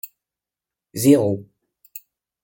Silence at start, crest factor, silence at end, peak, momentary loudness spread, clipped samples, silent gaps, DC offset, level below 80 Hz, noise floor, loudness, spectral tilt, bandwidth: 0.95 s; 20 dB; 0.45 s; -2 dBFS; 24 LU; under 0.1%; none; under 0.1%; -64 dBFS; -88 dBFS; -18 LUFS; -6 dB/octave; 17 kHz